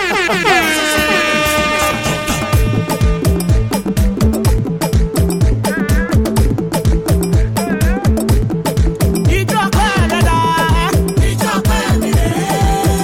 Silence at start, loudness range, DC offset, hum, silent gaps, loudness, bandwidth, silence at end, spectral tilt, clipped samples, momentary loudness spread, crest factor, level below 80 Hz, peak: 0 s; 1 LU; under 0.1%; none; none; -14 LUFS; 17 kHz; 0 s; -5 dB/octave; under 0.1%; 4 LU; 12 dB; -18 dBFS; 0 dBFS